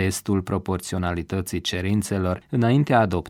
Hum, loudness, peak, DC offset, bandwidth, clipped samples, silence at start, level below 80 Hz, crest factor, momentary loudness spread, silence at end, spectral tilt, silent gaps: none; -23 LUFS; -6 dBFS; under 0.1%; 16.5 kHz; under 0.1%; 0 s; -46 dBFS; 16 dB; 8 LU; 0 s; -6 dB/octave; none